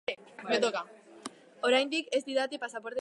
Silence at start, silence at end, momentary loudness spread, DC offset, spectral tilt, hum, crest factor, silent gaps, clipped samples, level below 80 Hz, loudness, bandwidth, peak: 0.1 s; 0 s; 19 LU; under 0.1%; -2.5 dB/octave; none; 20 dB; none; under 0.1%; -86 dBFS; -31 LUFS; 11.5 kHz; -12 dBFS